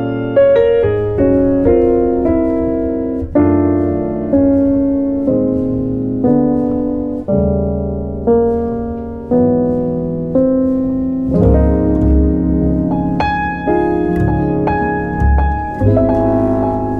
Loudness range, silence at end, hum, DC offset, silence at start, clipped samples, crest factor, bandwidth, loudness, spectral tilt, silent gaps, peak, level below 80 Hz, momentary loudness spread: 2 LU; 0 s; none; under 0.1%; 0 s; under 0.1%; 12 dB; 4.5 kHz; -14 LUFS; -11 dB/octave; none; 0 dBFS; -24 dBFS; 6 LU